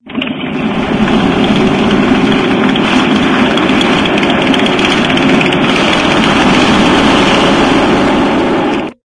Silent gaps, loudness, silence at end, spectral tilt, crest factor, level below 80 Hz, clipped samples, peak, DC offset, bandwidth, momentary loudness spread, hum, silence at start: none; -9 LUFS; 0.1 s; -5 dB/octave; 10 dB; -32 dBFS; 0.3%; 0 dBFS; under 0.1%; 11 kHz; 5 LU; none; 0.05 s